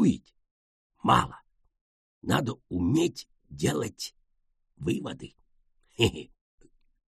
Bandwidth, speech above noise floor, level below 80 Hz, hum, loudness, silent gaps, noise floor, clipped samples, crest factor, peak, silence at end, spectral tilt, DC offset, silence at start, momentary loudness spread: 13 kHz; 45 dB; -54 dBFS; none; -29 LUFS; 0.51-0.90 s, 1.81-2.22 s; -72 dBFS; under 0.1%; 22 dB; -8 dBFS; 0.85 s; -5.5 dB/octave; under 0.1%; 0 s; 20 LU